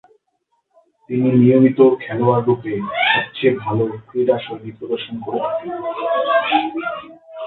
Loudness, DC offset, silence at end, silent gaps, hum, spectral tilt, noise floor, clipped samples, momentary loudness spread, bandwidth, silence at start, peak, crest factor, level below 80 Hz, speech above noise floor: -18 LUFS; under 0.1%; 0 s; none; none; -10.5 dB/octave; -68 dBFS; under 0.1%; 13 LU; 4.2 kHz; 1.1 s; 0 dBFS; 18 dB; -60 dBFS; 51 dB